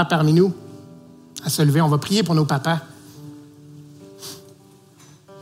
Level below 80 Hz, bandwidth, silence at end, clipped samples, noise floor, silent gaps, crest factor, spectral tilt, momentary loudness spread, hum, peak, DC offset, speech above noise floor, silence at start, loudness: -64 dBFS; 16 kHz; 0 s; under 0.1%; -49 dBFS; none; 18 dB; -6 dB/octave; 24 LU; none; -4 dBFS; under 0.1%; 32 dB; 0 s; -19 LUFS